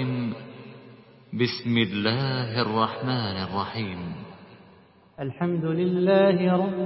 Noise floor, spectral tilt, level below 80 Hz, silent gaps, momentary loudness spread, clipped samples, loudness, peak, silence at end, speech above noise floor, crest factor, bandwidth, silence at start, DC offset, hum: -54 dBFS; -10.5 dB/octave; -58 dBFS; none; 18 LU; under 0.1%; -25 LUFS; -6 dBFS; 0 s; 30 dB; 20 dB; 5.8 kHz; 0 s; under 0.1%; none